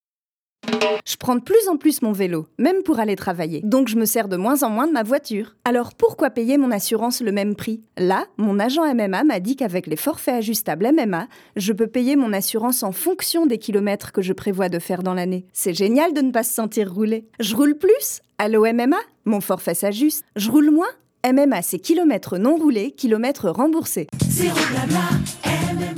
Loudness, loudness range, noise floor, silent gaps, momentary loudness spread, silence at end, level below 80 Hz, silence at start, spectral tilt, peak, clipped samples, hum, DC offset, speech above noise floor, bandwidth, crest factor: -20 LUFS; 2 LU; under -90 dBFS; none; 7 LU; 0 s; -56 dBFS; 0.65 s; -5 dB/octave; -4 dBFS; under 0.1%; none; under 0.1%; over 70 dB; over 20 kHz; 16 dB